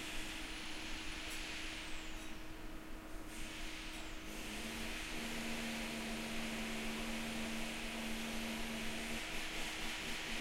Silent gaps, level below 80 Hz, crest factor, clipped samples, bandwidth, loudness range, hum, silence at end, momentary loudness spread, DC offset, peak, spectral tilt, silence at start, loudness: none; -50 dBFS; 14 dB; under 0.1%; 16 kHz; 5 LU; none; 0 s; 7 LU; under 0.1%; -28 dBFS; -2.5 dB/octave; 0 s; -43 LUFS